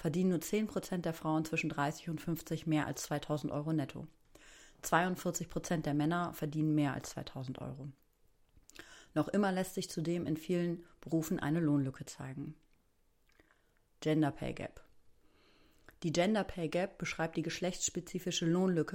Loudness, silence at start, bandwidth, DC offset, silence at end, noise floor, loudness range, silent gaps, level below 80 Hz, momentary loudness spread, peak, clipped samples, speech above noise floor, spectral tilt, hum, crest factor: -36 LUFS; 0 s; 16.5 kHz; under 0.1%; 0 s; -72 dBFS; 4 LU; none; -62 dBFS; 13 LU; -16 dBFS; under 0.1%; 37 dB; -5.5 dB/octave; none; 22 dB